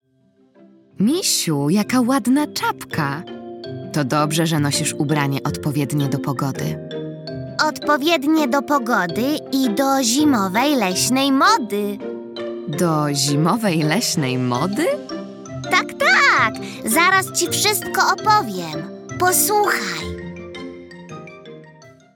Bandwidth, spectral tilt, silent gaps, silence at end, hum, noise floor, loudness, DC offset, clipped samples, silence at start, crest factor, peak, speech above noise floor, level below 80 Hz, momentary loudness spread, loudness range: 19.5 kHz; -4 dB/octave; none; 0.25 s; none; -58 dBFS; -18 LUFS; under 0.1%; under 0.1%; 1 s; 16 dB; -2 dBFS; 39 dB; -58 dBFS; 16 LU; 4 LU